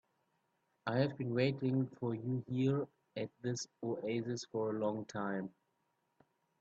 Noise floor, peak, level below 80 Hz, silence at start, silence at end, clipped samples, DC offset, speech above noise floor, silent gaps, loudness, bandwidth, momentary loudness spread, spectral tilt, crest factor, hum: -81 dBFS; -18 dBFS; -78 dBFS; 0.85 s; 1.1 s; under 0.1%; under 0.1%; 44 dB; none; -38 LUFS; 8 kHz; 9 LU; -6.5 dB/octave; 20 dB; none